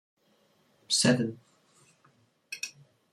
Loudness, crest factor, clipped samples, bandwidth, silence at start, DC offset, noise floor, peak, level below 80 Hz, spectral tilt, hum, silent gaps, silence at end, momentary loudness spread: -28 LUFS; 22 dB; under 0.1%; 15 kHz; 0.9 s; under 0.1%; -68 dBFS; -10 dBFS; -72 dBFS; -3.5 dB/octave; none; none; 0.45 s; 19 LU